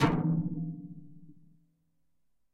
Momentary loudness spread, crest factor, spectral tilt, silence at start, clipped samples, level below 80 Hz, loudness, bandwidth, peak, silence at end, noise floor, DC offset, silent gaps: 22 LU; 20 dB; -7.5 dB/octave; 0 s; under 0.1%; -56 dBFS; -32 LUFS; 7.6 kHz; -14 dBFS; 1.2 s; -82 dBFS; under 0.1%; none